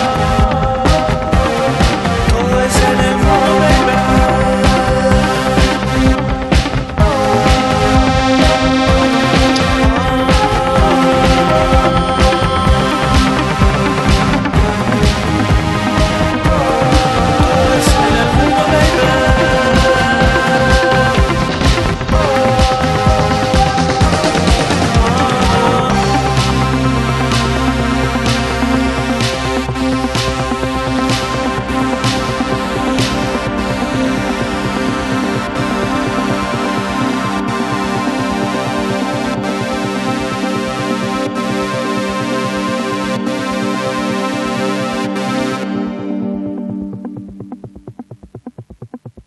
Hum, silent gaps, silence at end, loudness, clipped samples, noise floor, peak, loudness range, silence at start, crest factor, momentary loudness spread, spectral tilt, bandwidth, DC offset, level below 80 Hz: none; none; 0.05 s; -13 LUFS; under 0.1%; -33 dBFS; 0 dBFS; 6 LU; 0 s; 14 dB; 7 LU; -5.5 dB/octave; 12.5 kHz; under 0.1%; -22 dBFS